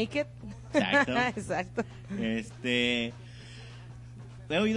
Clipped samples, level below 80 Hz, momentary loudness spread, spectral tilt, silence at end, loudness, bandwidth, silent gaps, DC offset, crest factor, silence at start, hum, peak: under 0.1%; -56 dBFS; 22 LU; -5 dB/octave; 0 s; -30 LUFS; 11.5 kHz; none; under 0.1%; 20 dB; 0 s; 60 Hz at -45 dBFS; -12 dBFS